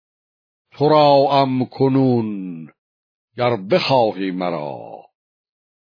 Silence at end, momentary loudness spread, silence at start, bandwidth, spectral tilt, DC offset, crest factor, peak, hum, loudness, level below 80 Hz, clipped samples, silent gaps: 0.95 s; 18 LU; 0.8 s; 5.4 kHz; -8 dB/octave; under 0.1%; 16 dB; -2 dBFS; none; -17 LUFS; -66 dBFS; under 0.1%; 2.78-3.28 s